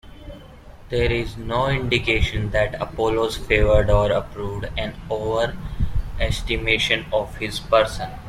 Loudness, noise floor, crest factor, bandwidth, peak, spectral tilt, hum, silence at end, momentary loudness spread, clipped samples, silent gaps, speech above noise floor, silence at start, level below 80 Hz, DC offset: -22 LUFS; -42 dBFS; 18 dB; 15 kHz; -2 dBFS; -5.5 dB/octave; none; 0 s; 10 LU; under 0.1%; none; 21 dB; 0.05 s; -30 dBFS; under 0.1%